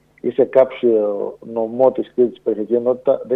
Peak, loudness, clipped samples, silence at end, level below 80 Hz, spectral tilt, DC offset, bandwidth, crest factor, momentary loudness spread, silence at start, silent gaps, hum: 0 dBFS; -18 LUFS; under 0.1%; 0 s; -66 dBFS; -9 dB/octave; under 0.1%; 3.9 kHz; 16 dB; 9 LU; 0.25 s; none; none